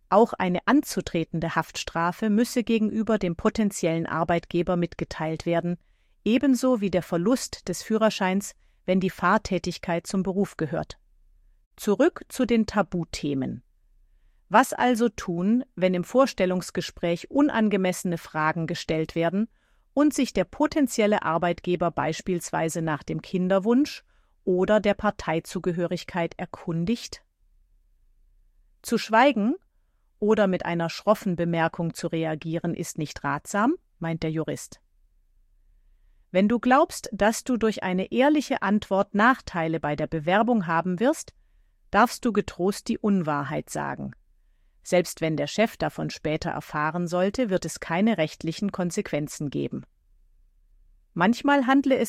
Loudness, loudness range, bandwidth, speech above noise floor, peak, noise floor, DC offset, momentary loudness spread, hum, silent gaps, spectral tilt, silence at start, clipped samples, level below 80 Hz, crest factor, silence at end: -25 LUFS; 4 LU; 15.5 kHz; 41 dB; -4 dBFS; -65 dBFS; under 0.1%; 9 LU; none; 11.66-11.71 s; -5.5 dB/octave; 0.1 s; under 0.1%; -52 dBFS; 20 dB; 0 s